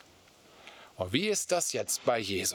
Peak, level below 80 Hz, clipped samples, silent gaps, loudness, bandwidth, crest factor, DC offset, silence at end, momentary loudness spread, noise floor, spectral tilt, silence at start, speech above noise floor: -10 dBFS; -76 dBFS; under 0.1%; none; -30 LUFS; over 20 kHz; 22 dB; under 0.1%; 0 s; 21 LU; -59 dBFS; -2.5 dB/octave; 0.6 s; 28 dB